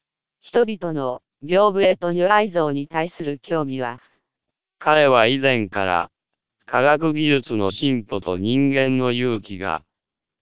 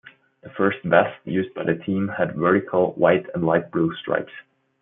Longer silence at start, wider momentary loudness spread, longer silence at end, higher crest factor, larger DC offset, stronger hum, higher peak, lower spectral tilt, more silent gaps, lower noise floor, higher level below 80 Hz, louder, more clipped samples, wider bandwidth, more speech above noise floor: about the same, 0.45 s vs 0.45 s; first, 11 LU vs 7 LU; first, 0.65 s vs 0.4 s; about the same, 20 dB vs 20 dB; first, 0.7% vs under 0.1%; neither; about the same, -2 dBFS vs -2 dBFS; about the same, -10 dB/octave vs -11 dB/octave; neither; first, -85 dBFS vs -45 dBFS; first, -54 dBFS vs -62 dBFS; about the same, -20 LUFS vs -22 LUFS; neither; about the same, 4 kHz vs 3.8 kHz; first, 66 dB vs 24 dB